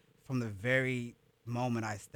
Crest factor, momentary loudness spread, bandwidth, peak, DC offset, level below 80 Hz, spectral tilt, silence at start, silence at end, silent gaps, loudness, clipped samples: 18 dB; 12 LU; 19.5 kHz; -18 dBFS; under 0.1%; -68 dBFS; -6 dB/octave; 0.3 s; 0.1 s; none; -35 LUFS; under 0.1%